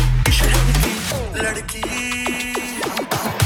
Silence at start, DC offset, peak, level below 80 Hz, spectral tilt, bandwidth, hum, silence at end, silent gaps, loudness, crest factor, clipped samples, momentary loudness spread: 0 s; under 0.1%; -2 dBFS; -22 dBFS; -4 dB/octave; 20 kHz; none; 0 s; none; -20 LUFS; 16 dB; under 0.1%; 7 LU